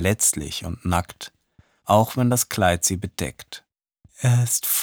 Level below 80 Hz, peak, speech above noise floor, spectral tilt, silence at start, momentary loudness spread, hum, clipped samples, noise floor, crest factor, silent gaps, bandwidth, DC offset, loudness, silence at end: -44 dBFS; -2 dBFS; 37 dB; -4 dB/octave; 0 s; 19 LU; none; under 0.1%; -59 dBFS; 20 dB; none; over 20 kHz; under 0.1%; -21 LUFS; 0 s